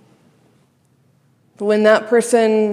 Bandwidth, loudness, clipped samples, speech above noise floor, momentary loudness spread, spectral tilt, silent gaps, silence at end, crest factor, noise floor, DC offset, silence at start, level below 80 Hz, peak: 14 kHz; -15 LUFS; under 0.1%; 44 dB; 6 LU; -4.5 dB/octave; none; 0 s; 18 dB; -58 dBFS; under 0.1%; 1.6 s; -76 dBFS; 0 dBFS